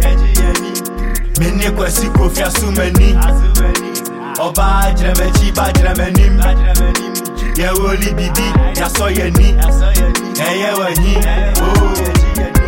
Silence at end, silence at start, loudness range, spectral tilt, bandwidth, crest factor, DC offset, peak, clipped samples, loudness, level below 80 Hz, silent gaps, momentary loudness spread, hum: 0 s; 0 s; 1 LU; -4.5 dB/octave; 17 kHz; 10 dB; under 0.1%; 0 dBFS; under 0.1%; -14 LUFS; -12 dBFS; none; 6 LU; none